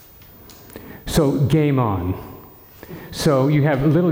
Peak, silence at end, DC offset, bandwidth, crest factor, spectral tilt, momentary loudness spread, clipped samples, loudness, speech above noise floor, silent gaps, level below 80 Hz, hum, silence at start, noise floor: -6 dBFS; 0 s; under 0.1%; 17 kHz; 12 dB; -7 dB/octave; 22 LU; under 0.1%; -18 LUFS; 27 dB; none; -42 dBFS; none; 0.75 s; -44 dBFS